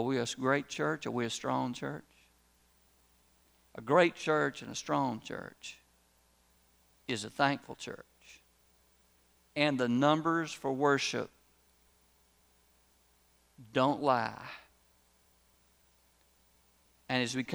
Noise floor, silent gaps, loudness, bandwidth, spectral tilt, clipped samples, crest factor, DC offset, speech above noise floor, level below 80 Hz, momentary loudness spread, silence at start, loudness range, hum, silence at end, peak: -69 dBFS; none; -32 LUFS; over 20 kHz; -4.5 dB/octave; under 0.1%; 24 dB; under 0.1%; 37 dB; -72 dBFS; 19 LU; 0 s; 7 LU; none; 0 s; -12 dBFS